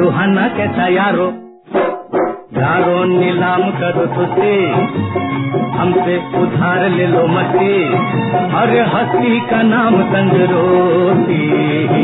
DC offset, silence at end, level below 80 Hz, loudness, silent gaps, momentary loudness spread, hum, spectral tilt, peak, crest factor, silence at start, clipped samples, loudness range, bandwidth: under 0.1%; 0 s; -54 dBFS; -14 LUFS; none; 6 LU; none; -11 dB/octave; 0 dBFS; 12 dB; 0 s; under 0.1%; 3 LU; 4.1 kHz